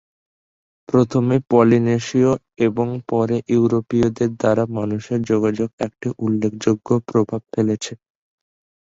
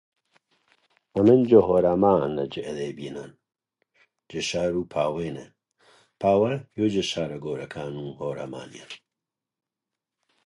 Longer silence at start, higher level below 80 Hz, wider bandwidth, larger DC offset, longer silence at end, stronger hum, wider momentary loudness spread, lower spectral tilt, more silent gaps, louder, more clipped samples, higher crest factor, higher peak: second, 0.9 s vs 1.15 s; about the same, -52 dBFS vs -56 dBFS; second, 8 kHz vs 11.5 kHz; neither; second, 0.85 s vs 1.5 s; neither; second, 8 LU vs 20 LU; first, -7.5 dB/octave vs -6 dB/octave; first, 5.73-5.78 s vs none; first, -19 LUFS vs -24 LUFS; neither; about the same, 18 dB vs 22 dB; about the same, -2 dBFS vs -4 dBFS